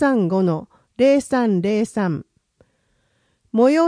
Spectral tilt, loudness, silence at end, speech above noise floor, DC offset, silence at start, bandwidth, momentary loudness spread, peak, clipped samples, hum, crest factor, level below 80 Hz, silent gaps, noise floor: -7 dB/octave; -19 LUFS; 0 s; 48 dB; under 0.1%; 0 s; 10.5 kHz; 10 LU; -4 dBFS; under 0.1%; none; 16 dB; -60 dBFS; none; -65 dBFS